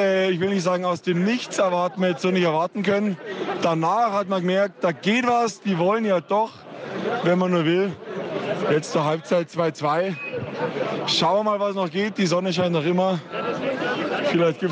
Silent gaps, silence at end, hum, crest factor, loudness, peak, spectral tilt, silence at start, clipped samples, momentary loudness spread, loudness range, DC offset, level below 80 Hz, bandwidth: none; 0 s; none; 14 dB; -23 LUFS; -8 dBFS; -5.5 dB/octave; 0 s; under 0.1%; 7 LU; 1 LU; under 0.1%; -70 dBFS; 9.6 kHz